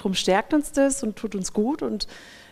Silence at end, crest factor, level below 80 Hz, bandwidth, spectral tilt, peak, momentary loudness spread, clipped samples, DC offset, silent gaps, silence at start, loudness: 0.1 s; 18 dB; -48 dBFS; 15.5 kHz; -4 dB/octave; -8 dBFS; 10 LU; under 0.1%; under 0.1%; none; 0 s; -24 LUFS